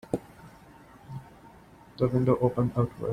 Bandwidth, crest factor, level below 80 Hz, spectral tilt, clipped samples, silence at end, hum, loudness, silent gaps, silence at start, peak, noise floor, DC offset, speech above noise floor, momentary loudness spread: 10.5 kHz; 20 dB; -54 dBFS; -9.5 dB/octave; under 0.1%; 0 s; none; -27 LUFS; none; 0.1 s; -10 dBFS; -53 dBFS; under 0.1%; 27 dB; 20 LU